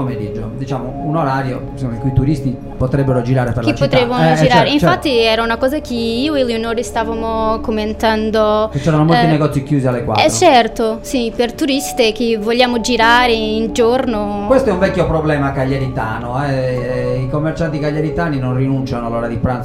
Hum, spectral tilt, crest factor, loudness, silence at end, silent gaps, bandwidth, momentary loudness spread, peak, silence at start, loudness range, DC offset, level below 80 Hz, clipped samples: none; -5.5 dB/octave; 14 dB; -15 LUFS; 0 s; none; 16 kHz; 9 LU; 0 dBFS; 0 s; 5 LU; under 0.1%; -32 dBFS; under 0.1%